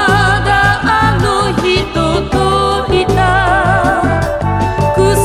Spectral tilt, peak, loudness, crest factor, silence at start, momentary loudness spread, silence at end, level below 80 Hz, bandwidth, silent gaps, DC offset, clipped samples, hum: -5.5 dB/octave; 0 dBFS; -12 LUFS; 12 dB; 0 s; 4 LU; 0 s; -24 dBFS; 15 kHz; none; under 0.1%; under 0.1%; none